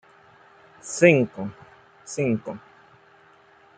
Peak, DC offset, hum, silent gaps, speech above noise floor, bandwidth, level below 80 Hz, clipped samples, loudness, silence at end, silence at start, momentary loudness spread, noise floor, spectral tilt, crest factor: -2 dBFS; under 0.1%; none; none; 33 dB; 9.4 kHz; -68 dBFS; under 0.1%; -22 LUFS; 1.2 s; 0.85 s; 22 LU; -55 dBFS; -5.5 dB/octave; 24 dB